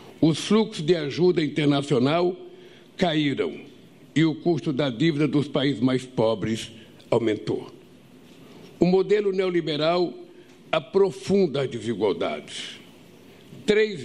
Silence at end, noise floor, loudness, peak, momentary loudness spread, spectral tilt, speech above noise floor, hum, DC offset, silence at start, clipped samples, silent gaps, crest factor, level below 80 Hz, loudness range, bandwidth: 0 s; -50 dBFS; -24 LUFS; -4 dBFS; 10 LU; -6.5 dB/octave; 27 dB; none; 0.1%; 0 s; under 0.1%; none; 20 dB; -60 dBFS; 3 LU; 12 kHz